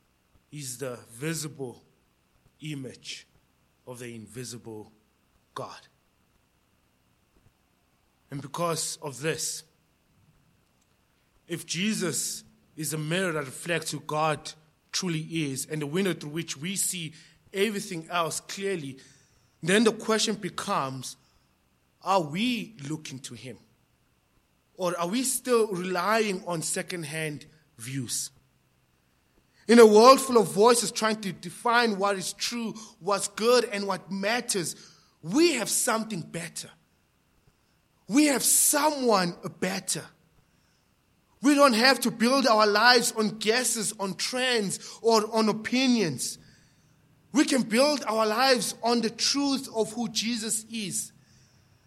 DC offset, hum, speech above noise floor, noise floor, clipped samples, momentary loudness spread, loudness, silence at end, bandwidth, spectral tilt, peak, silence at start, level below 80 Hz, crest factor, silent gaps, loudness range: under 0.1%; none; 42 dB; -68 dBFS; under 0.1%; 19 LU; -25 LUFS; 0.8 s; 16.5 kHz; -3 dB/octave; -4 dBFS; 0.55 s; -72 dBFS; 24 dB; none; 16 LU